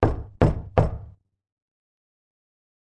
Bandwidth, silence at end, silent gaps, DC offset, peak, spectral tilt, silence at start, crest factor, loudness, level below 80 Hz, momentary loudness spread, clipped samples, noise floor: 8.4 kHz; 1.75 s; none; under 0.1%; -4 dBFS; -9.5 dB/octave; 0 s; 24 dB; -24 LUFS; -34 dBFS; 8 LU; under 0.1%; -45 dBFS